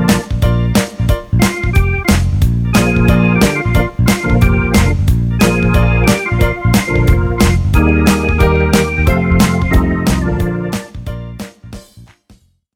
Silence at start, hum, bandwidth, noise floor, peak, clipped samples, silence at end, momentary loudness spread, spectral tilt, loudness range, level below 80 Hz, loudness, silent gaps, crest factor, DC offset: 0 s; none; 17 kHz; -48 dBFS; 0 dBFS; under 0.1%; 0.7 s; 6 LU; -6 dB/octave; 3 LU; -18 dBFS; -13 LUFS; none; 12 dB; under 0.1%